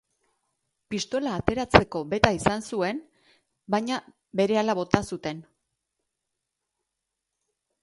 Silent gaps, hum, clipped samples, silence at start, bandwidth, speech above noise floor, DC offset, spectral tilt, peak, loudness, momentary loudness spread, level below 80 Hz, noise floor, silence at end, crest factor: none; none; under 0.1%; 0.9 s; 11.5 kHz; 59 dB; under 0.1%; -5 dB/octave; 0 dBFS; -26 LUFS; 13 LU; -48 dBFS; -84 dBFS; 2.4 s; 28 dB